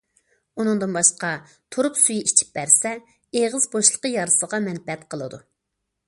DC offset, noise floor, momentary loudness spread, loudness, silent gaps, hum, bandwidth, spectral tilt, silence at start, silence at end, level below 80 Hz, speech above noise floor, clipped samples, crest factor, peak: under 0.1%; -79 dBFS; 16 LU; -19 LUFS; none; none; 11.5 kHz; -2.5 dB/octave; 0.55 s; 0.7 s; -68 dBFS; 57 dB; under 0.1%; 22 dB; 0 dBFS